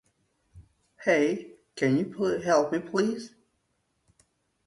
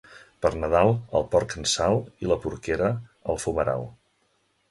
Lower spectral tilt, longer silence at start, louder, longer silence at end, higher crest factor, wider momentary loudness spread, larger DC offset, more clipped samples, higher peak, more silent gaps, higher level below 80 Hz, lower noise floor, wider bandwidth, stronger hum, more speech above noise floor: about the same, -5.5 dB/octave vs -5 dB/octave; first, 0.55 s vs 0.1 s; about the same, -27 LUFS vs -25 LUFS; first, 1.4 s vs 0.8 s; about the same, 20 dB vs 18 dB; first, 13 LU vs 8 LU; neither; neither; second, -10 dBFS vs -6 dBFS; neither; second, -66 dBFS vs -44 dBFS; first, -75 dBFS vs -69 dBFS; about the same, 11.5 kHz vs 11.5 kHz; neither; first, 49 dB vs 44 dB